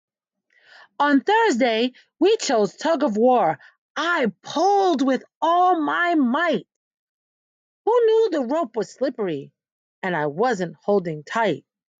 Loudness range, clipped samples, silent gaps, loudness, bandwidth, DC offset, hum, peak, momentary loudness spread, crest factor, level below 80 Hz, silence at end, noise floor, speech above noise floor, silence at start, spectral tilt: 4 LU; under 0.1%; 3.78-3.95 s, 5.35-5.41 s, 6.76-6.91 s, 6.99-7.85 s, 9.72-10.02 s; -21 LUFS; 9.2 kHz; under 0.1%; none; -8 dBFS; 9 LU; 14 dB; -76 dBFS; 0.4 s; -67 dBFS; 47 dB; 1 s; -4.5 dB/octave